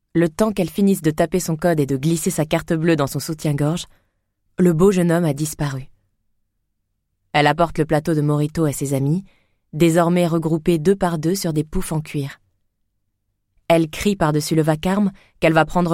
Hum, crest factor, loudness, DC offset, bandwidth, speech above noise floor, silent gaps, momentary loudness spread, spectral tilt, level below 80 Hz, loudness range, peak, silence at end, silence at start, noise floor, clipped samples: 50 Hz at -45 dBFS; 16 dB; -19 LUFS; under 0.1%; 16.5 kHz; 54 dB; none; 8 LU; -6 dB/octave; -42 dBFS; 3 LU; -4 dBFS; 0 s; 0.15 s; -72 dBFS; under 0.1%